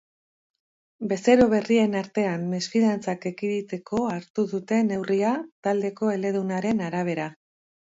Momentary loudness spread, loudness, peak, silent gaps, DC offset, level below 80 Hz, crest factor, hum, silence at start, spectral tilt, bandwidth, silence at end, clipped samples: 9 LU; -25 LUFS; -6 dBFS; 4.30-4.34 s, 5.52-5.63 s; under 0.1%; -60 dBFS; 18 dB; none; 1 s; -6 dB/octave; 7.8 kHz; 0.6 s; under 0.1%